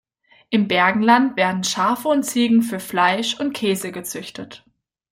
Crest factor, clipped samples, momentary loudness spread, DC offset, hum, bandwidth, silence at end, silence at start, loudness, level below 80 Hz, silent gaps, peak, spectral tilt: 18 dB; under 0.1%; 14 LU; under 0.1%; none; 16.5 kHz; 0.55 s; 0.5 s; -19 LUFS; -64 dBFS; none; -2 dBFS; -4 dB/octave